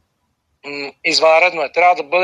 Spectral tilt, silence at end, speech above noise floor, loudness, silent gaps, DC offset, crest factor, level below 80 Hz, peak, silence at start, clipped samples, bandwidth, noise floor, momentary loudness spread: -1.5 dB/octave; 0 s; 53 dB; -13 LUFS; none; under 0.1%; 14 dB; -70 dBFS; -2 dBFS; 0.65 s; under 0.1%; 11 kHz; -68 dBFS; 15 LU